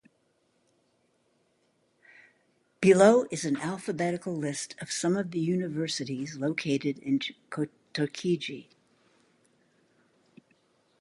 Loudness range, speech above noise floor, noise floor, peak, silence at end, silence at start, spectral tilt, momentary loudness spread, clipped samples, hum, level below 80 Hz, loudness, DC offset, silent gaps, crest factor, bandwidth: 9 LU; 44 dB; -71 dBFS; -6 dBFS; 2.4 s; 2.8 s; -5 dB/octave; 14 LU; under 0.1%; none; -72 dBFS; -28 LUFS; under 0.1%; none; 24 dB; 11.5 kHz